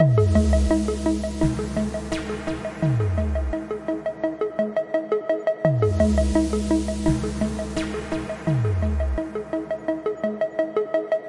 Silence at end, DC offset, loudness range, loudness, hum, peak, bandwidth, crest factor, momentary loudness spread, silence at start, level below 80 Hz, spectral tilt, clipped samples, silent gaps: 0 s; under 0.1%; 3 LU; -24 LUFS; none; -4 dBFS; 11.5 kHz; 18 dB; 9 LU; 0 s; -32 dBFS; -7.5 dB/octave; under 0.1%; none